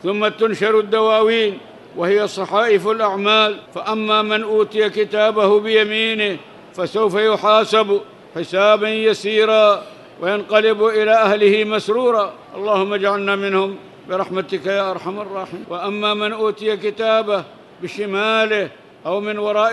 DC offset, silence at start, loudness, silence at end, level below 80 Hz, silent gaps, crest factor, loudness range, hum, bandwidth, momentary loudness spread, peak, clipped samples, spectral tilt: under 0.1%; 0.05 s; -17 LUFS; 0 s; -70 dBFS; none; 16 dB; 6 LU; none; 11.5 kHz; 12 LU; -2 dBFS; under 0.1%; -4.5 dB/octave